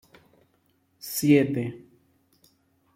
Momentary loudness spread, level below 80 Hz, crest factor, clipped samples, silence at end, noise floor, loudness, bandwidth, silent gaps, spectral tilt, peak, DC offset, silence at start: 22 LU; -68 dBFS; 22 dB; under 0.1%; 1.2 s; -68 dBFS; -24 LUFS; 16 kHz; none; -6 dB/octave; -6 dBFS; under 0.1%; 1.05 s